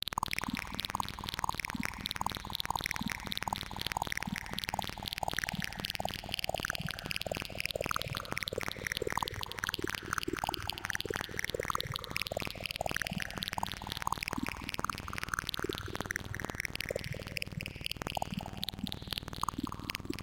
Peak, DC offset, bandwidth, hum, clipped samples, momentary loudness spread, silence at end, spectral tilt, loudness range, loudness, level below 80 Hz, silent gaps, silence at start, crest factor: -14 dBFS; under 0.1%; 17 kHz; none; under 0.1%; 3 LU; 0 s; -3 dB/octave; 2 LU; -37 LUFS; -52 dBFS; none; 0.05 s; 24 dB